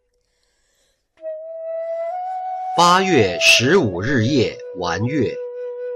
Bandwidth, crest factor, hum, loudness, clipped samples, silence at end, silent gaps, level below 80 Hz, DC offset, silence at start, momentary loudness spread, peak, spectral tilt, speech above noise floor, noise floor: 16 kHz; 18 dB; none; -17 LUFS; under 0.1%; 0 s; none; -50 dBFS; under 0.1%; 1.2 s; 18 LU; -2 dBFS; -4 dB/octave; 50 dB; -66 dBFS